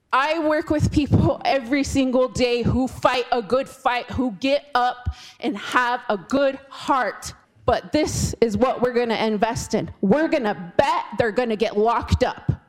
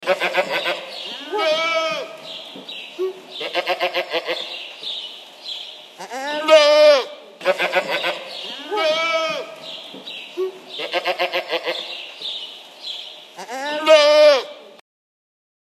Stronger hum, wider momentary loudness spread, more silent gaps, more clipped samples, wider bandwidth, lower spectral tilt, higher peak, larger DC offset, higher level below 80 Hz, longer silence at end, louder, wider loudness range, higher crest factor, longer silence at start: neither; second, 6 LU vs 20 LU; neither; neither; first, 16 kHz vs 14 kHz; first, -5.5 dB/octave vs -1.5 dB/octave; about the same, -2 dBFS vs 0 dBFS; neither; first, -40 dBFS vs under -90 dBFS; second, 0.1 s vs 1 s; second, -22 LUFS vs -19 LUFS; second, 2 LU vs 8 LU; about the same, 20 dB vs 20 dB; about the same, 0.1 s vs 0 s